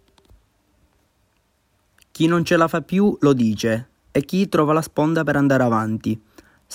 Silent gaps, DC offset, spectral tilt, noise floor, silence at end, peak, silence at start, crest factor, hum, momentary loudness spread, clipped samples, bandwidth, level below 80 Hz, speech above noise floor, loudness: none; under 0.1%; -6.5 dB/octave; -65 dBFS; 0 s; -4 dBFS; 2.15 s; 16 dB; none; 8 LU; under 0.1%; 16.5 kHz; -54 dBFS; 47 dB; -19 LUFS